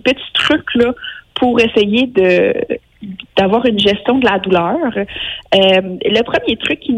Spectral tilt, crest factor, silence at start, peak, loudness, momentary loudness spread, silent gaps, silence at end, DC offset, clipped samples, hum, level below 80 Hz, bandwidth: -5.5 dB/octave; 14 dB; 0.05 s; 0 dBFS; -13 LUFS; 10 LU; none; 0 s; under 0.1%; under 0.1%; none; -44 dBFS; 10.5 kHz